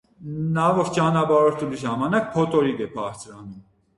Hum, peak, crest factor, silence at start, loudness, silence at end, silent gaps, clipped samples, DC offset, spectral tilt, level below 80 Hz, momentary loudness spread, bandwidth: none; -6 dBFS; 16 dB; 0.2 s; -22 LUFS; 0.35 s; none; under 0.1%; under 0.1%; -6.5 dB/octave; -56 dBFS; 18 LU; 11.5 kHz